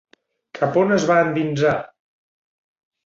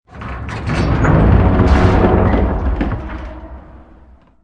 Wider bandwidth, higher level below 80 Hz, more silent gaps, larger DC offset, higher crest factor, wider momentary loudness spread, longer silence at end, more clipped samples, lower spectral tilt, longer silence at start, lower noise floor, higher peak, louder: second, 7.8 kHz vs 8.6 kHz; second, -60 dBFS vs -20 dBFS; neither; neither; about the same, 18 dB vs 14 dB; second, 7 LU vs 18 LU; first, 1.2 s vs 0.65 s; neither; second, -6 dB/octave vs -8.5 dB/octave; first, 0.55 s vs 0.15 s; about the same, -43 dBFS vs -44 dBFS; second, -4 dBFS vs 0 dBFS; second, -19 LUFS vs -14 LUFS